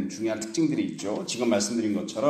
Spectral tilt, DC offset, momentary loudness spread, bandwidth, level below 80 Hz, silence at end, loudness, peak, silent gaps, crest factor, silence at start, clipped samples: -4.5 dB/octave; under 0.1%; 5 LU; 14 kHz; -68 dBFS; 0 s; -27 LUFS; -10 dBFS; none; 16 dB; 0 s; under 0.1%